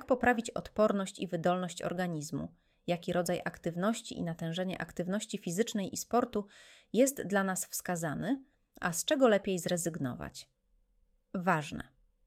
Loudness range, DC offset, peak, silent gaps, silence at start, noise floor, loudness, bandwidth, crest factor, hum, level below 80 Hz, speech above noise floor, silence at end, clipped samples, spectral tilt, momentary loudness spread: 4 LU; under 0.1%; -14 dBFS; none; 0 s; -71 dBFS; -33 LUFS; 16.5 kHz; 20 dB; none; -64 dBFS; 38 dB; 0.45 s; under 0.1%; -4.5 dB/octave; 11 LU